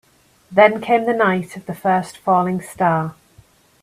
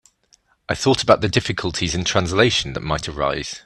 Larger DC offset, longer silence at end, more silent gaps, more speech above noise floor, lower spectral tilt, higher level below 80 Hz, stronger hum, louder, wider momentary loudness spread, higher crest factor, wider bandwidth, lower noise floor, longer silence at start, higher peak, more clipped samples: neither; first, 0.7 s vs 0.05 s; neither; second, 34 dB vs 40 dB; first, -6.5 dB/octave vs -4 dB/octave; second, -60 dBFS vs -42 dBFS; neither; about the same, -18 LUFS vs -19 LUFS; about the same, 10 LU vs 8 LU; about the same, 18 dB vs 20 dB; first, 15 kHz vs 12 kHz; second, -52 dBFS vs -59 dBFS; second, 0.5 s vs 0.7 s; about the same, 0 dBFS vs 0 dBFS; neither